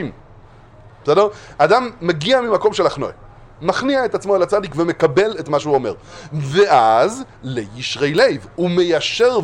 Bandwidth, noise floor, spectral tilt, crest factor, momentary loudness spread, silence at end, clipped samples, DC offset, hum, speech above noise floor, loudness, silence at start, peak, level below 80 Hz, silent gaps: 11 kHz; -43 dBFS; -5 dB/octave; 18 dB; 12 LU; 0 s; under 0.1%; under 0.1%; none; 26 dB; -17 LUFS; 0 s; 0 dBFS; -48 dBFS; none